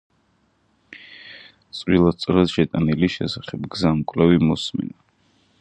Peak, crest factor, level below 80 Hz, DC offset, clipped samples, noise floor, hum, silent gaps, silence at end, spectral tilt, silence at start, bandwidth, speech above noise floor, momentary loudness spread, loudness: -2 dBFS; 20 dB; -44 dBFS; under 0.1%; under 0.1%; -64 dBFS; none; none; 0.7 s; -7 dB/octave; 0.9 s; 9.4 kHz; 44 dB; 22 LU; -20 LUFS